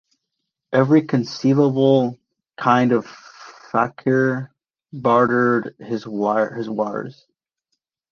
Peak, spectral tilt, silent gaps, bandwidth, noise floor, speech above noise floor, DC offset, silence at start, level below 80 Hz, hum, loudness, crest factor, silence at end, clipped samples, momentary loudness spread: -2 dBFS; -7.5 dB/octave; none; 6.8 kHz; -79 dBFS; 61 dB; under 0.1%; 0.7 s; -64 dBFS; none; -19 LUFS; 18 dB; 1 s; under 0.1%; 13 LU